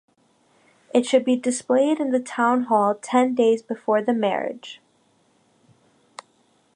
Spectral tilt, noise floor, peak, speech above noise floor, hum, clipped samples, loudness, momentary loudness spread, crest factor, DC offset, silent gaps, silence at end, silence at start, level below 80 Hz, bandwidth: -4.5 dB/octave; -63 dBFS; -6 dBFS; 42 dB; none; under 0.1%; -21 LUFS; 6 LU; 18 dB; under 0.1%; none; 2 s; 0.95 s; -80 dBFS; 10.5 kHz